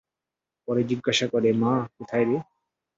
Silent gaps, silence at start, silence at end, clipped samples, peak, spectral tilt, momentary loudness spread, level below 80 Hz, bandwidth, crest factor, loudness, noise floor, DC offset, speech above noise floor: none; 0.7 s; 0.55 s; under 0.1%; -10 dBFS; -5 dB/octave; 7 LU; -66 dBFS; 8 kHz; 16 dB; -25 LUFS; -88 dBFS; under 0.1%; 64 dB